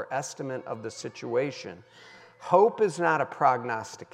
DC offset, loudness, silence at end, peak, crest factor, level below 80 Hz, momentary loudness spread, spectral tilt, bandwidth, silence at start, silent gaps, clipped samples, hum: under 0.1%; -27 LUFS; 0.1 s; -6 dBFS; 20 dB; -78 dBFS; 17 LU; -5 dB/octave; 12.5 kHz; 0 s; none; under 0.1%; none